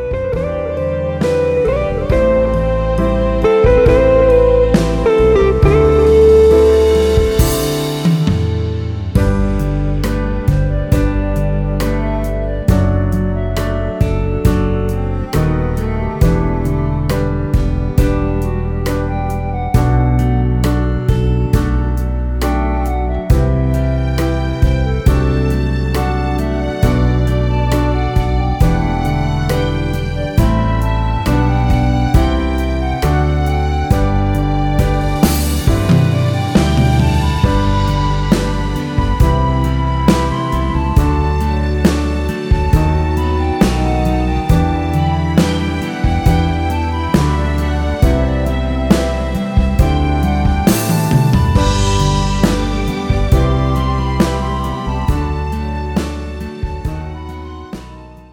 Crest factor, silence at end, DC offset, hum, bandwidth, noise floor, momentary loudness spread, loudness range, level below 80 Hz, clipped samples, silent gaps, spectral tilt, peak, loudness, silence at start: 14 dB; 0.1 s; under 0.1%; none; 19.5 kHz; -34 dBFS; 7 LU; 5 LU; -18 dBFS; under 0.1%; none; -7 dB/octave; 0 dBFS; -15 LUFS; 0 s